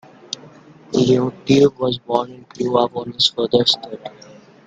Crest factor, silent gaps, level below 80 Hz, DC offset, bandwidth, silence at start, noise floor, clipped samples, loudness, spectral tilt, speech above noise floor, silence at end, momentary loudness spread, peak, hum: 18 dB; none; -56 dBFS; under 0.1%; 9.2 kHz; 0.3 s; -44 dBFS; under 0.1%; -18 LUFS; -5.5 dB/octave; 26 dB; 0.6 s; 17 LU; 0 dBFS; none